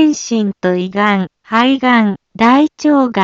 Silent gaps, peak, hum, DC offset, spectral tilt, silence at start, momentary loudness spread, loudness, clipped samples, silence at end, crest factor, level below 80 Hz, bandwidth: none; 0 dBFS; none; under 0.1%; -5 dB/octave; 0 s; 6 LU; -13 LUFS; under 0.1%; 0 s; 12 dB; -56 dBFS; 7.8 kHz